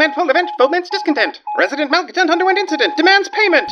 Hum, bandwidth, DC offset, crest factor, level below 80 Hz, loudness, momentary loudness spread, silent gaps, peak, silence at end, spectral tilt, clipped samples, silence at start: none; 9 kHz; under 0.1%; 14 dB; -76 dBFS; -14 LUFS; 6 LU; none; 0 dBFS; 0 s; -1.5 dB/octave; under 0.1%; 0 s